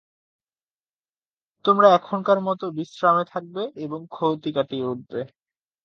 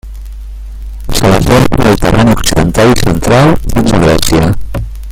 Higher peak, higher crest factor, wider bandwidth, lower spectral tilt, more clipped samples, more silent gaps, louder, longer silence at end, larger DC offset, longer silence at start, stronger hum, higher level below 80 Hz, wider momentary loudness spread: about the same, -2 dBFS vs 0 dBFS; first, 22 dB vs 8 dB; second, 7 kHz vs 17 kHz; first, -7 dB/octave vs -5.5 dB/octave; second, under 0.1% vs 0.4%; neither; second, -22 LUFS vs -9 LUFS; first, 0.6 s vs 0 s; neither; first, 1.65 s vs 0.05 s; neither; second, -74 dBFS vs -18 dBFS; second, 16 LU vs 20 LU